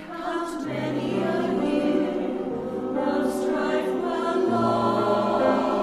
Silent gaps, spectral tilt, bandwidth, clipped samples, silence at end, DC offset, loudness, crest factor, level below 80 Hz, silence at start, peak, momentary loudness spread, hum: none; -6.5 dB/octave; 13.5 kHz; under 0.1%; 0 s; under 0.1%; -25 LUFS; 14 dB; -58 dBFS; 0 s; -10 dBFS; 7 LU; none